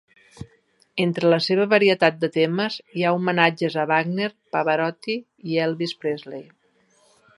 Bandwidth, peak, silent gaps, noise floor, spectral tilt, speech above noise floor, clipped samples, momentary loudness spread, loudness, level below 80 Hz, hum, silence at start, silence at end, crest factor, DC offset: 11.5 kHz; 0 dBFS; none; -62 dBFS; -6.5 dB/octave; 40 dB; under 0.1%; 11 LU; -22 LUFS; -66 dBFS; none; 0.4 s; 0.95 s; 22 dB; under 0.1%